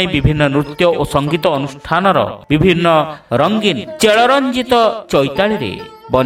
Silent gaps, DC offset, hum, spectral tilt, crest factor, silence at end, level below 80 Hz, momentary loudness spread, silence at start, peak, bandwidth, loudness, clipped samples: none; under 0.1%; none; -5.5 dB/octave; 14 dB; 0 s; -36 dBFS; 7 LU; 0 s; 0 dBFS; 16.5 kHz; -14 LUFS; under 0.1%